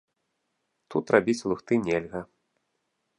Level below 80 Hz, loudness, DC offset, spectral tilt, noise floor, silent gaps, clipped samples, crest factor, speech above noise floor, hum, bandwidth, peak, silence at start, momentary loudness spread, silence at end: -62 dBFS; -26 LUFS; under 0.1%; -6 dB/octave; -78 dBFS; none; under 0.1%; 26 dB; 53 dB; none; 11 kHz; -4 dBFS; 0.9 s; 12 LU; 0.95 s